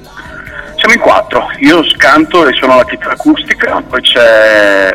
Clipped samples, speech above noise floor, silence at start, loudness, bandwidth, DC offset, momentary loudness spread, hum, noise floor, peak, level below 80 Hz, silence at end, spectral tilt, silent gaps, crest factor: 3%; 20 dB; 0.15 s; -7 LUFS; 16.5 kHz; under 0.1%; 12 LU; none; -27 dBFS; 0 dBFS; -38 dBFS; 0 s; -3.5 dB/octave; none; 8 dB